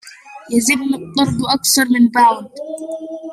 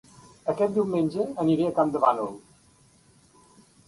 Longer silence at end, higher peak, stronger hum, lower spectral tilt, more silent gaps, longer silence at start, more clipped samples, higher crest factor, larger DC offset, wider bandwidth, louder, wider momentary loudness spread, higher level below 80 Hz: second, 0 s vs 1.5 s; first, -2 dBFS vs -8 dBFS; neither; second, -3 dB/octave vs -8 dB/octave; neither; second, 0.05 s vs 0.45 s; neither; about the same, 16 dB vs 20 dB; neither; first, 15.5 kHz vs 11.5 kHz; first, -15 LUFS vs -25 LUFS; first, 16 LU vs 11 LU; first, -54 dBFS vs -64 dBFS